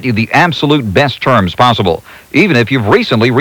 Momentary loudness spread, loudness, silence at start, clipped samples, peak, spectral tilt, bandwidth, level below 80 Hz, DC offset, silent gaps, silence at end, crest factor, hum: 4 LU; -10 LUFS; 0 s; 0.6%; 0 dBFS; -6.5 dB/octave; 19.5 kHz; -42 dBFS; under 0.1%; none; 0 s; 10 dB; none